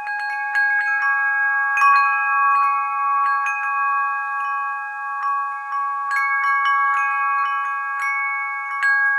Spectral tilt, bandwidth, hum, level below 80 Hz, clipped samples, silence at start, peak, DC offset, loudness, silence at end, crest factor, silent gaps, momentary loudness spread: 4.5 dB/octave; 12 kHz; none; -82 dBFS; under 0.1%; 0 s; -6 dBFS; under 0.1%; -19 LUFS; 0 s; 14 dB; none; 8 LU